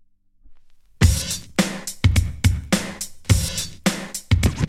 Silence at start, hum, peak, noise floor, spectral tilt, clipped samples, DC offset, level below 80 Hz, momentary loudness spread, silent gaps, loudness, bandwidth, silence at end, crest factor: 0.45 s; none; -2 dBFS; -51 dBFS; -4.5 dB/octave; under 0.1%; under 0.1%; -28 dBFS; 6 LU; none; -22 LUFS; 16 kHz; 0 s; 18 dB